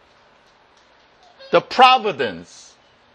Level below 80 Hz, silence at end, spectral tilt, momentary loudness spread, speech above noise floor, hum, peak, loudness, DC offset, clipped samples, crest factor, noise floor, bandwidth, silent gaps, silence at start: -66 dBFS; 0.7 s; -3.5 dB/octave; 13 LU; 38 dB; none; 0 dBFS; -16 LUFS; under 0.1%; under 0.1%; 20 dB; -54 dBFS; 9.2 kHz; none; 1.5 s